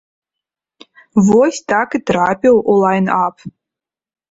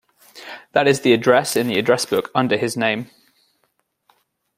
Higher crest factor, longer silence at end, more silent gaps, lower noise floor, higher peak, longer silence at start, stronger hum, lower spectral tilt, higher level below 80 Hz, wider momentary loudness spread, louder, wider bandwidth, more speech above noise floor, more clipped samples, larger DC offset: second, 14 dB vs 20 dB; second, 0.85 s vs 1.5 s; neither; first, -86 dBFS vs -69 dBFS; about the same, -2 dBFS vs -2 dBFS; first, 1.15 s vs 0.35 s; neither; first, -6.5 dB/octave vs -4.5 dB/octave; first, -52 dBFS vs -64 dBFS; second, 6 LU vs 21 LU; first, -14 LUFS vs -18 LUFS; second, 8 kHz vs 16 kHz; first, 73 dB vs 51 dB; neither; neither